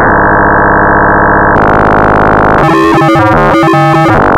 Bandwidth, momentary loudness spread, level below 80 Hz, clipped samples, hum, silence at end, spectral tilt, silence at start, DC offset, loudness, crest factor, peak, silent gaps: 15.5 kHz; 0 LU; -20 dBFS; under 0.1%; none; 0 s; -7.5 dB/octave; 0 s; under 0.1%; -6 LUFS; 6 dB; 0 dBFS; none